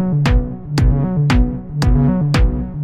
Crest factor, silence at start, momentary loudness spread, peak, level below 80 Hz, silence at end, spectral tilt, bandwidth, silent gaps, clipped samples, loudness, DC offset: 12 dB; 0 s; 5 LU; -2 dBFS; -18 dBFS; 0 s; -7.5 dB/octave; 10.5 kHz; none; under 0.1%; -16 LUFS; 0.6%